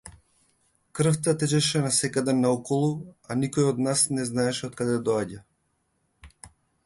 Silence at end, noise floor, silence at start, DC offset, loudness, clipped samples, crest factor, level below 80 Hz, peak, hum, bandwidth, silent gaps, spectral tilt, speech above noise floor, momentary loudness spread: 0.35 s; -73 dBFS; 0.05 s; under 0.1%; -25 LUFS; under 0.1%; 18 dB; -60 dBFS; -10 dBFS; none; 11.5 kHz; none; -4.5 dB/octave; 48 dB; 7 LU